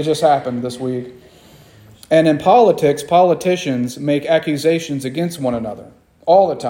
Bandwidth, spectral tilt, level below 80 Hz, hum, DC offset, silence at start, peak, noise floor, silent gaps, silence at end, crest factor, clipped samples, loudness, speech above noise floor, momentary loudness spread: 17 kHz; -6 dB/octave; -56 dBFS; none; under 0.1%; 0 s; 0 dBFS; -45 dBFS; none; 0 s; 16 dB; under 0.1%; -16 LUFS; 29 dB; 12 LU